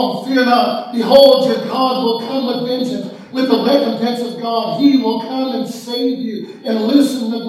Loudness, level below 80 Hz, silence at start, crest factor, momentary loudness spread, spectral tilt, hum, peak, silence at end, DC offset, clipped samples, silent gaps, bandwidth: -15 LUFS; -62 dBFS; 0 s; 14 dB; 11 LU; -5 dB/octave; none; 0 dBFS; 0 s; under 0.1%; 0.1%; none; 14 kHz